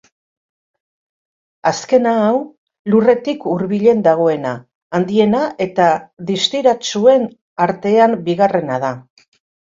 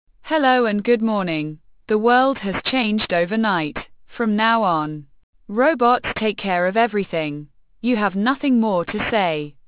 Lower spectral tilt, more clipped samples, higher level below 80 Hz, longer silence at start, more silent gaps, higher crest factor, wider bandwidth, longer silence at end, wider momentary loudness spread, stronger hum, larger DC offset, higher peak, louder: second, -5.5 dB/octave vs -9.5 dB/octave; neither; second, -60 dBFS vs -52 dBFS; first, 1.65 s vs 0.25 s; first, 2.58-2.67 s, 2.79-2.85 s, 4.75-4.90 s, 7.41-7.56 s vs 5.23-5.33 s; about the same, 16 dB vs 16 dB; first, 7.8 kHz vs 4 kHz; first, 0.6 s vs 0.15 s; about the same, 10 LU vs 11 LU; neither; neither; first, 0 dBFS vs -4 dBFS; first, -15 LUFS vs -20 LUFS